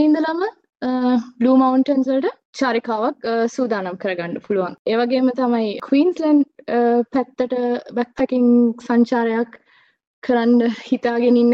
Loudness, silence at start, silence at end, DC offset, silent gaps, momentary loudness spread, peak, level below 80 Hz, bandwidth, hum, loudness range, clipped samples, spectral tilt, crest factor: -19 LUFS; 0 s; 0 s; under 0.1%; 2.45-2.53 s, 4.79-4.85 s, 10.07-10.22 s; 9 LU; -4 dBFS; -62 dBFS; 7.4 kHz; none; 3 LU; under 0.1%; -6.5 dB/octave; 14 dB